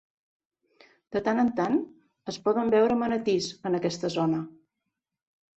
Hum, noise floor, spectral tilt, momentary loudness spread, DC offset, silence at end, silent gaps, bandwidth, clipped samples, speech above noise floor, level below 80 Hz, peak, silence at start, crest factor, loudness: none; -84 dBFS; -6 dB/octave; 13 LU; under 0.1%; 1.1 s; none; 8.2 kHz; under 0.1%; 58 dB; -66 dBFS; -12 dBFS; 1.1 s; 16 dB; -27 LUFS